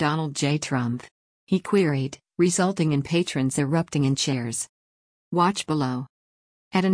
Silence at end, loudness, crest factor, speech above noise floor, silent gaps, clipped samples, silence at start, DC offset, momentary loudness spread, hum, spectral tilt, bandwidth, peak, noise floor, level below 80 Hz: 0 s; -24 LUFS; 16 dB; over 67 dB; 1.11-1.47 s, 4.69-5.31 s, 6.09-6.71 s; under 0.1%; 0 s; under 0.1%; 8 LU; none; -5 dB/octave; 10.5 kHz; -8 dBFS; under -90 dBFS; -60 dBFS